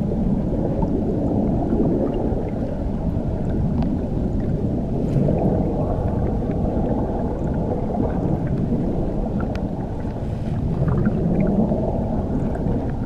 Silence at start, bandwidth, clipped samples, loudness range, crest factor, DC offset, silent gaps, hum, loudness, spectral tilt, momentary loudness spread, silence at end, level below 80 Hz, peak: 0 s; 8.2 kHz; under 0.1%; 1 LU; 14 dB; under 0.1%; none; none; -22 LUFS; -10.5 dB/octave; 5 LU; 0 s; -28 dBFS; -8 dBFS